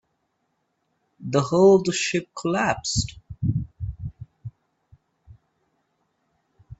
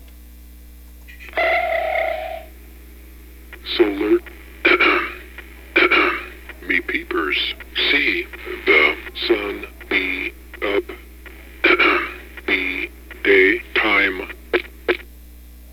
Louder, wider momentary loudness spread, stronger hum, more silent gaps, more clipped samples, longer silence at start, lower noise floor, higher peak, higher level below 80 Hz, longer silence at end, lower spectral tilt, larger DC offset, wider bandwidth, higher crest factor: second, -22 LUFS vs -18 LUFS; first, 24 LU vs 18 LU; second, none vs 60 Hz at -40 dBFS; neither; neither; first, 1.2 s vs 0 s; first, -74 dBFS vs -41 dBFS; about the same, -4 dBFS vs -2 dBFS; about the same, -46 dBFS vs -42 dBFS; about the same, 0.05 s vs 0 s; about the same, -5 dB/octave vs -4.5 dB/octave; neither; second, 8.4 kHz vs over 20 kHz; about the same, 20 dB vs 20 dB